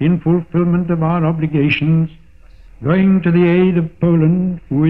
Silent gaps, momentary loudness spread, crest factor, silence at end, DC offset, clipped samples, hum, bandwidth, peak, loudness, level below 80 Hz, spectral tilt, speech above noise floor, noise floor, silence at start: none; 5 LU; 12 dB; 0 s; 0.5%; under 0.1%; none; 5.4 kHz; -2 dBFS; -15 LUFS; -42 dBFS; -10.5 dB/octave; 29 dB; -43 dBFS; 0 s